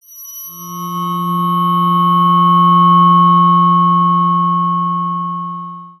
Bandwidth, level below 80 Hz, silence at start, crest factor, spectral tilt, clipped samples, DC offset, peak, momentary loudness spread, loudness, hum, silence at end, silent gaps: 12.5 kHz; -64 dBFS; 0.1 s; 12 dB; -6.5 dB/octave; under 0.1%; under 0.1%; -2 dBFS; 18 LU; -11 LUFS; none; 0.1 s; none